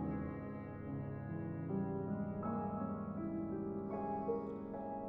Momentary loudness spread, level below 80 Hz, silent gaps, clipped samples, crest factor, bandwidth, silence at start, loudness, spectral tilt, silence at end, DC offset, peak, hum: 5 LU; -62 dBFS; none; under 0.1%; 14 dB; 3.3 kHz; 0 s; -42 LUFS; -10.5 dB/octave; 0 s; under 0.1%; -26 dBFS; none